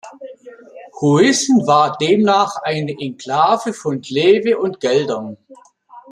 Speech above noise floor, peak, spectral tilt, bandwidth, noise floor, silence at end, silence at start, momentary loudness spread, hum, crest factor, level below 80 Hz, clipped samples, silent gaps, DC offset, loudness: 23 dB; 0 dBFS; -4.5 dB/octave; 12.5 kHz; -39 dBFS; 0.1 s; 0.05 s; 13 LU; none; 16 dB; -62 dBFS; under 0.1%; none; under 0.1%; -16 LUFS